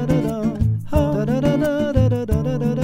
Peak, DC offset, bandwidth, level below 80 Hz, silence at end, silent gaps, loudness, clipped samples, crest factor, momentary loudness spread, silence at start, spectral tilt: -4 dBFS; under 0.1%; 16 kHz; -30 dBFS; 0 s; none; -20 LUFS; under 0.1%; 14 dB; 3 LU; 0 s; -8.5 dB/octave